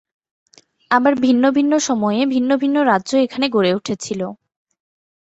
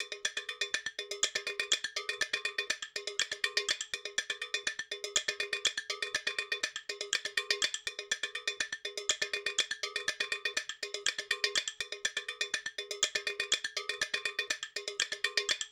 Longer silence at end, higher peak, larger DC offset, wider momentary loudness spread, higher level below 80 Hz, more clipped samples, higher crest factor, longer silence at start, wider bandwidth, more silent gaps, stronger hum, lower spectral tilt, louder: first, 0.85 s vs 0 s; first, -2 dBFS vs -10 dBFS; neither; first, 9 LU vs 5 LU; first, -62 dBFS vs -74 dBFS; neither; second, 16 dB vs 26 dB; first, 0.9 s vs 0 s; second, 8.2 kHz vs over 20 kHz; neither; neither; first, -4.5 dB/octave vs 2 dB/octave; first, -17 LUFS vs -34 LUFS